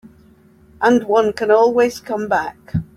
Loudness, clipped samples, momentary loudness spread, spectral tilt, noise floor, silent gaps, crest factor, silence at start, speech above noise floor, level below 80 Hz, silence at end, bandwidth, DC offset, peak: -17 LUFS; under 0.1%; 11 LU; -6 dB/octave; -49 dBFS; none; 16 dB; 0.05 s; 33 dB; -50 dBFS; 0.1 s; 14.5 kHz; under 0.1%; -2 dBFS